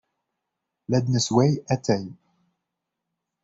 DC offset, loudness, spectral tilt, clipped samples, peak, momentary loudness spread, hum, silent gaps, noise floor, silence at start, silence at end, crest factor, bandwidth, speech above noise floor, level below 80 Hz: under 0.1%; -23 LUFS; -6 dB/octave; under 0.1%; -8 dBFS; 14 LU; none; none; -83 dBFS; 0.9 s; 1.3 s; 20 dB; 8 kHz; 61 dB; -60 dBFS